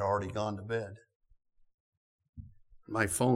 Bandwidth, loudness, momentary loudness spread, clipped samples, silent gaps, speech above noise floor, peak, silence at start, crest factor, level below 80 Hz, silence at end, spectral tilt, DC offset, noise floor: 17 kHz; -34 LUFS; 23 LU; under 0.1%; 1.15-1.20 s, 1.74-2.19 s, 2.29-2.33 s; 19 dB; -12 dBFS; 0 s; 22 dB; -62 dBFS; 0 s; -5 dB/octave; under 0.1%; -52 dBFS